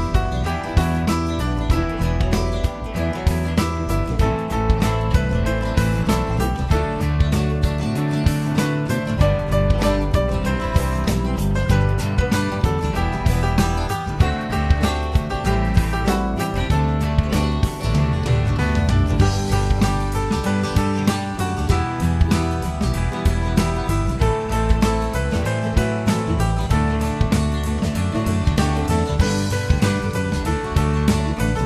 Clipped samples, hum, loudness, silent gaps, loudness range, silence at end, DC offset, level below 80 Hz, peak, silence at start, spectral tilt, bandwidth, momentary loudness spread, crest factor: under 0.1%; none; -20 LUFS; none; 1 LU; 0 s; under 0.1%; -24 dBFS; -2 dBFS; 0 s; -6.5 dB/octave; 14 kHz; 3 LU; 16 dB